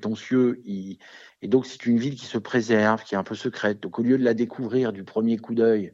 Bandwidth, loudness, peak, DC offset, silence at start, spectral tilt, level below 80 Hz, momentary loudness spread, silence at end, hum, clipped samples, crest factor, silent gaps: 7.6 kHz; -24 LUFS; -4 dBFS; under 0.1%; 0 s; -6.5 dB/octave; -74 dBFS; 11 LU; 0 s; none; under 0.1%; 20 dB; none